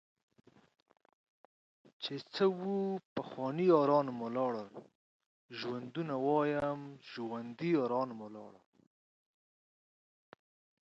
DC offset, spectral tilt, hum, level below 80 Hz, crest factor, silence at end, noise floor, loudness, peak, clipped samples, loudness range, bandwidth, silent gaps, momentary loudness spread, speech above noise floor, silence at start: under 0.1%; -7.5 dB/octave; none; -78 dBFS; 22 dB; 2.3 s; under -90 dBFS; -35 LUFS; -16 dBFS; under 0.1%; 6 LU; 7.8 kHz; 3.05-3.16 s, 4.95-5.20 s, 5.26-5.49 s; 18 LU; over 56 dB; 2 s